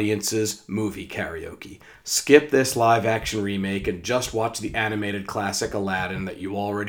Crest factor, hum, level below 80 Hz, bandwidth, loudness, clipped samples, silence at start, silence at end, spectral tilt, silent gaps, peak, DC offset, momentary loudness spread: 24 dB; none; -48 dBFS; over 20 kHz; -23 LUFS; under 0.1%; 0 s; 0 s; -4 dB/octave; none; 0 dBFS; under 0.1%; 13 LU